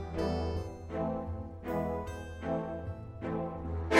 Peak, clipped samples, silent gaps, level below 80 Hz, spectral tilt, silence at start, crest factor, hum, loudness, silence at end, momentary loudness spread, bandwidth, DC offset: -10 dBFS; under 0.1%; none; -46 dBFS; -6.5 dB/octave; 0 s; 26 dB; none; -37 LUFS; 0 s; 7 LU; 16 kHz; under 0.1%